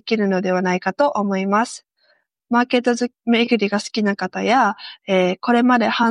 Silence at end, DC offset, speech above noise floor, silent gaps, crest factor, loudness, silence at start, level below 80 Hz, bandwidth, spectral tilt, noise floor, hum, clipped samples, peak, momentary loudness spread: 0 s; under 0.1%; 44 dB; none; 14 dB; -19 LUFS; 0.05 s; -68 dBFS; 11 kHz; -5.5 dB/octave; -62 dBFS; none; under 0.1%; -4 dBFS; 5 LU